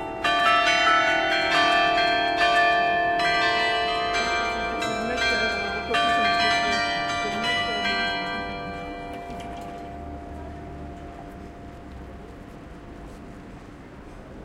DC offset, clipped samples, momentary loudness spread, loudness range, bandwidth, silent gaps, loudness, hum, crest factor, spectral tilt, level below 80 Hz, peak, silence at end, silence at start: under 0.1%; under 0.1%; 23 LU; 20 LU; 13.5 kHz; none; -22 LUFS; none; 18 dB; -3 dB/octave; -46 dBFS; -8 dBFS; 0 s; 0 s